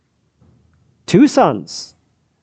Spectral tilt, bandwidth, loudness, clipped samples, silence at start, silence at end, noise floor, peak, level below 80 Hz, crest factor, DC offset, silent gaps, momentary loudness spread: -6 dB/octave; 8.8 kHz; -13 LUFS; under 0.1%; 1.1 s; 0.55 s; -55 dBFS; 0 dBFS; -56 dBFS; 18 dB; under 0.1%; none; 23 LU